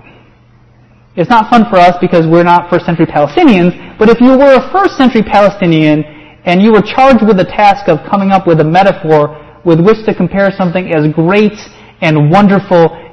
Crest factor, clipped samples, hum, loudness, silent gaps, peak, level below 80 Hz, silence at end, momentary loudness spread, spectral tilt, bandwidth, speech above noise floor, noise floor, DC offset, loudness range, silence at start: 8 dB; 2%; none; -8 LUFS; none; 0 dBFS; -38 dBFS; 0.05 s; 7 LU; -8 dB/octave; 8.6 kHz; 35 dB; -43 dBFS; under 0.1%; 2 LU; 1.15 s